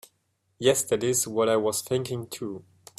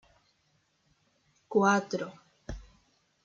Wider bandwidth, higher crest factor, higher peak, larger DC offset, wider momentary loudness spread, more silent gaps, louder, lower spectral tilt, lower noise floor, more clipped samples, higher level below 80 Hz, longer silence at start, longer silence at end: first, 16 kHz vs 7.6 kHz; about the same, 20 dB vs 22 dB; first, -8 dBFS vs -12 dBFS; neither; second, 12 LU vs 22 LU; neither; about the same, -26 LUFS vs -28 LUFS; second, -3.5 dB/octave vs -5.5 dB/octave; about the same, -73 dBFS vs -73 dBFS; neither; second, -66 dBFS vs -56 dBFS; second, 0.6 s vs 1.5 s; second, 0.35 s vs 0.6 s